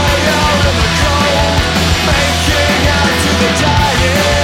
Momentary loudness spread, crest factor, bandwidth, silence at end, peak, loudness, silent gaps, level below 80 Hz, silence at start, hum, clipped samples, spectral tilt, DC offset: 1 LU; 12 dB; 16.5 kHz; 0 s; 0 dBFS; -11 LUFS; none; -20 dBFS; 0 s; none; under 0.1%; -4 dB/octave; under 0.1%